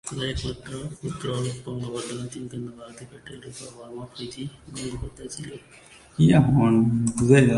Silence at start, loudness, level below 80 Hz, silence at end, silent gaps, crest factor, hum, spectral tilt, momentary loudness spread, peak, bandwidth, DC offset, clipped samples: 0.05 s; -24 LUFS; -46 dBFS; 0 s; none; 22 dB; none; -6.5 dB/octave; 22 LU; -2 dBFS; 11.5 kHz; under 0.1%; under 0.1%